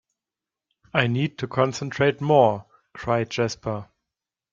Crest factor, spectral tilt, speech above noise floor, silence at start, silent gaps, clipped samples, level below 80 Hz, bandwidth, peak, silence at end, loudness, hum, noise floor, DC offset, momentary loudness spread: 22 dB; -6 dB/octave; 66 dB; 0.95 s; none; under 0.1%; -58 dBFS; 7.6 kHz; -2 dBFS; 0.7 s; -23 LUFS; none; -89 dBFS; under 0.1%; 13 LU